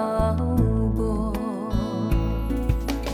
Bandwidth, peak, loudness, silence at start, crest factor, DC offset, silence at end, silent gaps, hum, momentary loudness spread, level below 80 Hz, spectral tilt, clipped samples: 15.5 kHz; -8 dBFS; -25 LUFS; 0 s; 14 dB; under 0.1%; 0 s; none; none; 5 LU; -28 dBFS; -8 dB/octave; under 0.1%